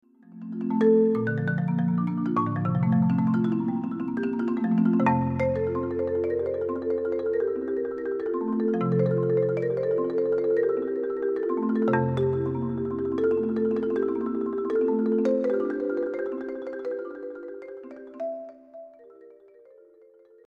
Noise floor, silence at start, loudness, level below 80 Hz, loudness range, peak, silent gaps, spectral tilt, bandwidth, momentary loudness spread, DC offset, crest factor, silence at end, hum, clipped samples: -55 dBFS; 0.3 s; -26 LUFS; -60 dBFS; 8 LU; -10 dBFS; none; -10.5 dB/octave; 5 kHz; 12 LU; under 0.1%; 16 dB; 1.15 s; none; under 0.1%